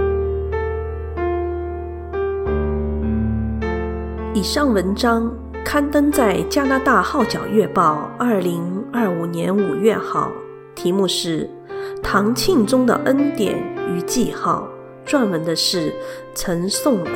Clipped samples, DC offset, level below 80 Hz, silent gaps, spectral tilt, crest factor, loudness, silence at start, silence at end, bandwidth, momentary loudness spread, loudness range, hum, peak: under 0.1%; under 0.1%; -32 dBFS; none; -5 dB/octave; 16 dB; -20 LUFS; 0 s; 0 s; 17 kHz; 10 LU; 5 LU; none; -2 dBFS